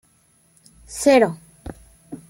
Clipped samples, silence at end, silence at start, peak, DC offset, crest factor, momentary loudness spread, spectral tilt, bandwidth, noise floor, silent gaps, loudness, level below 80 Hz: under 0.1%; 0.15 s; 0.9 s; -2 dBFS; under 0.1%; 20 dB; 24 LU; -4.5 dB/octave; 16.5 kHz; -59 dBFS; none; -17 LUFS; -50 dBFS